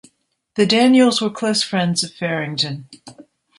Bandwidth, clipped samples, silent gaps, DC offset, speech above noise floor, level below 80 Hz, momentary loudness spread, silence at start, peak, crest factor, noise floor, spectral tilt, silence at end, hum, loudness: 11.5 kHz; under 0.1%; none; under 0.1%; 44 dB; -64 dBFS; 10 LU; 0.55 s; -2 dBFS; 16 dB; -62 dBFS; -4.5 dB/octave; 0.4 s; none; -17 LUFS